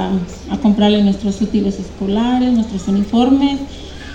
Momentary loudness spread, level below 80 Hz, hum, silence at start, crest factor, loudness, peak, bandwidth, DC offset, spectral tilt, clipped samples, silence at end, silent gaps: 11 LU; -36 dBFS; none; 0 s; 14 dB; -16 LUFS; -2 dBFS; 8.8 kHz; under 0.1%; -7 dB/octave; under 0.1%; 0 s; none